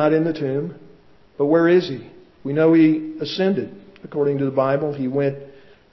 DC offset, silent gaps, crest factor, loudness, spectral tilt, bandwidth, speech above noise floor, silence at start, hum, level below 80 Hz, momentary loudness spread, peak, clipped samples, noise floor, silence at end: under 0.1%; none; 16 dB; -20 LUFS; -8.5 dB/octave; 6 kHz; 30 dB; 0 s; none; -64 dBFS; 16 LU; -4 dBFS; under 0.1%; -49 dBFS; 0.4 s